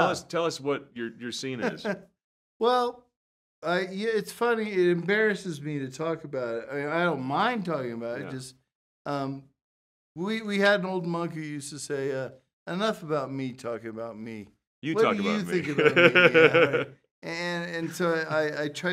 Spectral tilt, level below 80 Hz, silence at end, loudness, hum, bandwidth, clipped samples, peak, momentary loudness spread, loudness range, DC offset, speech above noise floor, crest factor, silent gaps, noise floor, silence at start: -5 dB/octave; -74 dBFS; 0 s; -27 LUFS; none; 15 kHz; under 0.1%; -4 dBFS; 15 LU; 10 LU; under 0.1%; over 63 dB; 24 dB; 2.24-2.60 s, 3.16-3.62 s, 8.75-9.05 s, 9.62-10.15 s, 12.53-12.66 s, 14.67-14.82 s, 17.11-17.22 s; under -90 dBFS; 0 s